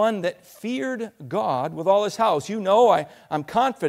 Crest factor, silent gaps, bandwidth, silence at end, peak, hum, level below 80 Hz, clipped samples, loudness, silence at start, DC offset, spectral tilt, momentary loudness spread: 16 dB; none; 15.5 kHz; 0 s; -6 dBFS; none; -66 dBFS; under 0.1%; -23 LUFS; 0 s; under 0.1%; -5.5 dB/octave; 12 LU